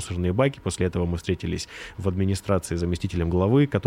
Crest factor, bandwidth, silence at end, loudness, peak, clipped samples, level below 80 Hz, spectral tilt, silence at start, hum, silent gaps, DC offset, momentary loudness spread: 16 dB; 15 kHz; 0 s; -25 LUFS; -8 dBFS; under 0.1%; -46 dBFS; -6.5 dB/octave; 0 s; none; none; under 0.1%; 9 LU